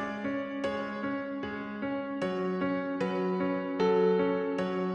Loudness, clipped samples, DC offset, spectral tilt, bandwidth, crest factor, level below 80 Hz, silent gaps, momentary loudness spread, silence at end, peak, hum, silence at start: -31 LUFS; under 0.1%; under 0.1%; -7.5 dB/octave; 9 kHz; 14 dB; -66 dBFS; none; 9 LU; 0 s; -16 dBFS; none; 0 s